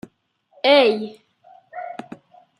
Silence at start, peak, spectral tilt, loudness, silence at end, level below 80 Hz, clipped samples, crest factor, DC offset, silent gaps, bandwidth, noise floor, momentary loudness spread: 0.65 s; -4 dBFS; -4.5 dB/octave; -17 LUFS; 0.65 s; -74 dBFS; under 0.1%; 20 dB; under 0.1%; none; 11.5 kHz; -63 dBFS; 22 LU